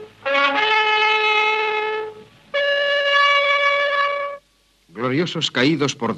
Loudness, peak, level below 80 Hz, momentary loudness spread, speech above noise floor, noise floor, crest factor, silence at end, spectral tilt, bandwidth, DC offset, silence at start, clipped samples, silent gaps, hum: -18 LUFS; -4 dBFS; -66 dBFS; 11 LU; 39 dB; -59 dBFS; 16 dB; 0 s; -3.5 dB/octave; 10 kHz; under 0.1%; 0 s; under 0.1%; none; none